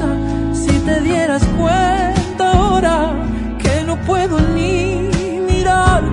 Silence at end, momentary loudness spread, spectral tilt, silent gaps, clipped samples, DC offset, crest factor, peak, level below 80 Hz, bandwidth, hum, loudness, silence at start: 0 s; 6 LU; -6 dB/octave; none; under 0.1%; under 0.1%; 14 dB; 0 dBFS; -22 dBFS; 11 kHz; none; -15 LUFS; 0 s